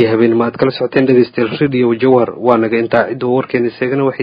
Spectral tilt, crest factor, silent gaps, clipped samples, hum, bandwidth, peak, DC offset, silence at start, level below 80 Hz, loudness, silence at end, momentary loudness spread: -9.5 dB/octave; 12 dB; none; under 0.1%; none; 5.2 kHz; 0 dBFS; under 0.1%; 0 s; -54 dBFS; -13 LUFS; 0 s; 5 LU